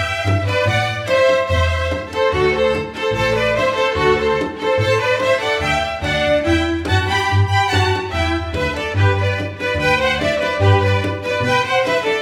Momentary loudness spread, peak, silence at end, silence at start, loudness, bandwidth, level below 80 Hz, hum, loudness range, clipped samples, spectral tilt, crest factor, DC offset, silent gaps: 5 LU; -2 dBFS; 0 s; 0 s; -17 LUFS; 13.5 kHz; -34 dBFS; none; 1 LU; under 0.1%; -5.5 dB/octave; 14 dB; under 0.1%; none